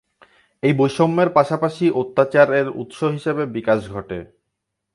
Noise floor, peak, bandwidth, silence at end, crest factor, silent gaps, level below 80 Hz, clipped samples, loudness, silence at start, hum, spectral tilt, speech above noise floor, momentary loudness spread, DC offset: -78 dBFS; 0 dBFS; 11.5 kHz; 0.7 s; 18 dB; none; -54 dBFS; under 0.1%; -19 LUFS; 0.65 s; none; -7.5 dB/octave; 60 dB; 12 LU; under 0.1%